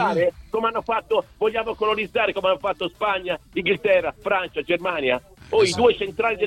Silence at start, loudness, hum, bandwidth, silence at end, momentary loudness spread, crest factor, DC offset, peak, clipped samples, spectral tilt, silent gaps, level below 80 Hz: 0 s; -22 LUFS; none; 13 kHz; 0 s; 6 LU; 16 dB; under 0.1%; -6 dBFS; under 0.1%; -4 dB/octave; none; -52 dBFS